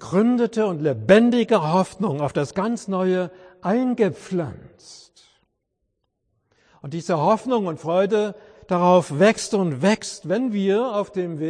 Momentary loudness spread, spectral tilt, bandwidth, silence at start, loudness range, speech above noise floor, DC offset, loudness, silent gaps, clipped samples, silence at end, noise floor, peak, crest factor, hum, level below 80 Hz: 11 LU; -6 dB/octave; 10.5 kHz; 0 s; 8 LU; 55 dB; under 0.1%; -21 LUFS; none; under 0.1%; 0 s; -75 dBFS; -2 dBFS; 20 dB; none; -60 dBFS